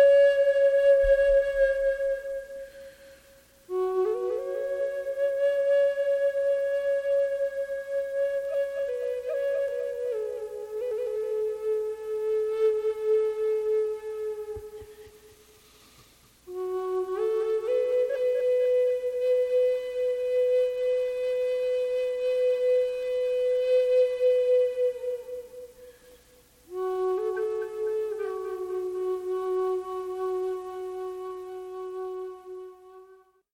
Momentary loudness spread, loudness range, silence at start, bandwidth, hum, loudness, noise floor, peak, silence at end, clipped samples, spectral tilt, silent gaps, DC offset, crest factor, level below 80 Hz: 13 LU; 7 LU; 0 s; 14 kHz; none; -27 LUFS; -58 dBFS; -12 dBFS; 0.4 s; under 0.1%; -5 dB/octave; none; under 0.1%; 14 dB; -54 dBFS